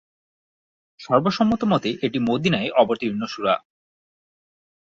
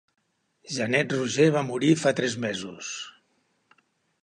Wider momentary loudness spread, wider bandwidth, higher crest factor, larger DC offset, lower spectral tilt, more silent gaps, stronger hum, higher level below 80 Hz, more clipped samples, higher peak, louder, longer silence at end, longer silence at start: second, 6 LU vs 13 LU; second, 7.6 kHz vs 11.5 kHz; about the same, 20 dB vs 20 dB; neither; first, -6.5 dB/octave vs -5 dB/octave; neither; neither; first, -58 dBFS vs -70 dBFS; neither; first, -4 dBFS vs -8 dBFS; first, -21 LUFS vs -25 LUFS; first, 1.4 s vs 1.15 s; first, 1 s vs 0.65 s